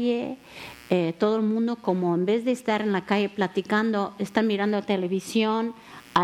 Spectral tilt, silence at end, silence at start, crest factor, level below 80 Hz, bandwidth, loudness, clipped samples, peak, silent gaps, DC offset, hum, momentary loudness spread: -6 dB/octave; 0 s; 0 s; 18 dB; -66 dBFS; 14 kHz; -25 LUFS; under 0.1%; -6 dBFS; none; under 0.1%; none; 7 LU